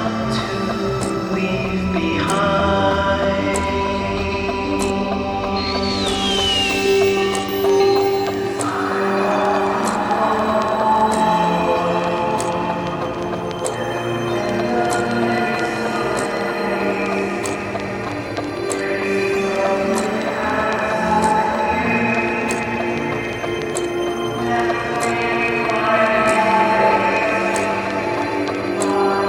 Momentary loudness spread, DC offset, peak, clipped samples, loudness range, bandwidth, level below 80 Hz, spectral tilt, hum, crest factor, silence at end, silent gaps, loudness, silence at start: 7 LU; under 0.1%; -2 dBFS; under 0.1%; 4 LU; 18 kHz; -42 dBFS; -4.5 dB/octave; none; 16 dB; 0 s; none; -19 LUFS; 0 s